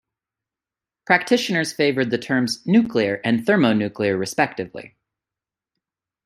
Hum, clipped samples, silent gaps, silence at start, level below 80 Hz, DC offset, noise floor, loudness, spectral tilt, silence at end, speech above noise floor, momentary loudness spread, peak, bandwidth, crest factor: none; under 0.1%; none; 1.1 s; -64 dBFS; under 0.1%; -89 dBFS; -20 LUFS; -5 dB/octave; 1.4 s; 69 dB; 5 LU; -2 dBFS; 15 kHz; 20 dB